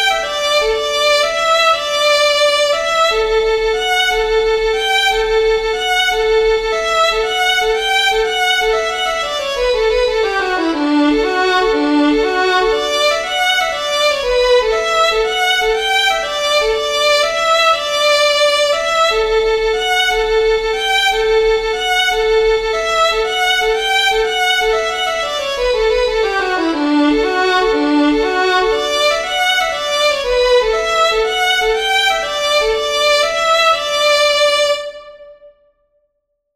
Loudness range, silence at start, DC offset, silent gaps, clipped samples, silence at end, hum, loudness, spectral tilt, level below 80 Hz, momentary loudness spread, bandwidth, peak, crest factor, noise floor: 2 LU; 0 s; under 0.1%; none; under 0.1%; 1.1 s; none; -14 LUFS; -1.5 dB/octave; -36 dBFS; 4 LU; 15 kHz; -2 dBFS; 14 dB; -70 dBFS